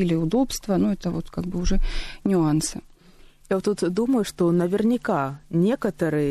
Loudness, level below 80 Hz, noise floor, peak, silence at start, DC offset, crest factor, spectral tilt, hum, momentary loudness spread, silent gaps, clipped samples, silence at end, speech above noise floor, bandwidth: -24 LUFS; -32 dBFS; -50 dBFS; -10 dBFS; 0 s; under 0.1%; 12 dB; -6 dB/octave; none; 8 LU; none; under 0.1%; 0 s; 28 dB; 13 kHz